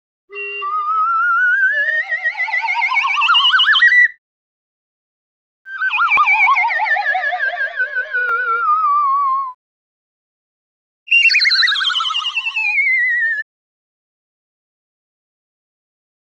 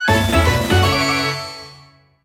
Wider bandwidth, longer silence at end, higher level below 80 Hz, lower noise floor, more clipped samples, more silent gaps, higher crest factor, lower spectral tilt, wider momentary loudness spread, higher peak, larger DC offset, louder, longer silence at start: second, 9.6 kHz vs 17 kHz; first, 2.95 s vs 0.5 s; second, -72 dBFS vs -30 dBFS; first, under -90 dBFS vs -48 dBFS; neither; first, 4.18-5.65 s, 9.54-11.06 s vs none; about the same, 14 dB vs 16 dB; second, 2.5 dB/octave vs -4.5 dB/octave; second, 11 LU vs 14 LU; about the same, -4 dBFS vs -2 dBFS; neither; about the same, -14 LUFS vs -16 LUFS; first, 0.3 s vs 0 s